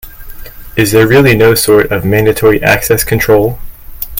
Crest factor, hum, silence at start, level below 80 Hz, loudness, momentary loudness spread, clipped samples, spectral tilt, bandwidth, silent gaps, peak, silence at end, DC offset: 10 dB; none; 0.05 s; -28 dBFS; -9 LUFS; 10 LU; 0.4%; -5 dB/octave; 17.5 kHz; none; 0 dBFS; 0 s; under 0.1%